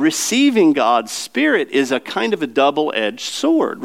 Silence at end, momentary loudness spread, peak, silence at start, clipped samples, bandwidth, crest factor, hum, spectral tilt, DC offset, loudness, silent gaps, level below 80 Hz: 0 s; 7 LU; -2 dBFS; 0 s; under 0.1%; 16 kHz; 14 dB; none; -3 dB/octave; 0.2%; -17 LUFS; none; -76 dBFS